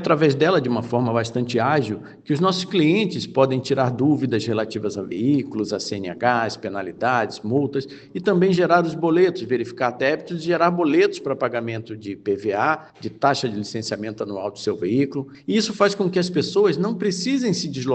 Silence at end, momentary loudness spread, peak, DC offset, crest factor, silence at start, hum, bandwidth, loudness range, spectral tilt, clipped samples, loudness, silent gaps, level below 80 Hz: 0 s; 10 LU; -2 dBFS; under 0.1%; 18 dB; 0 s; none; 9 kHz; 4 LU; -6 dB/octave; under 0.1%; -21 LUFS; none; -64 dBFS